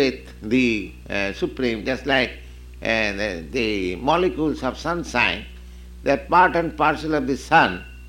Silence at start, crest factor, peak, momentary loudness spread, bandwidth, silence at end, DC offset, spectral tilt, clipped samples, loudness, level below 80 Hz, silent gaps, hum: 0 s; 18 dB; -4 dBFS; 10 LU; 16.5 kHz; 0 s; under 0.1%; -5 dB/octave; under 0.1%; -21 LUFS; -40 dBFS; none; none